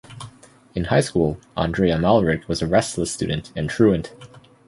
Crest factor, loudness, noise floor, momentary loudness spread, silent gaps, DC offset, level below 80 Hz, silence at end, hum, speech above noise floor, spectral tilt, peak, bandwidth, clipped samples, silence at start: 18 dB; -21 LUFS; -47 dBFS; 15 LU; none; under 0.1%; -40 dBFS; 0.3 s; none; 27 dB; -6 dB/octave; -2 dBFS; 11.5 kHz; under 0.1%; 0.1 s